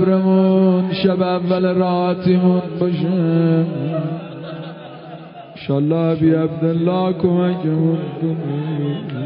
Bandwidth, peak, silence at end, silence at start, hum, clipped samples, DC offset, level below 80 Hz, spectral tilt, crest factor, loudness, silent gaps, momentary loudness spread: 5.4 kHz; -2 dBFS; 0 s; 0 s; none; under 0.1%; under 0.1%; -56 dBFS; -13 dB/octave; 14 dB; -17 LUFS; none; 16 LU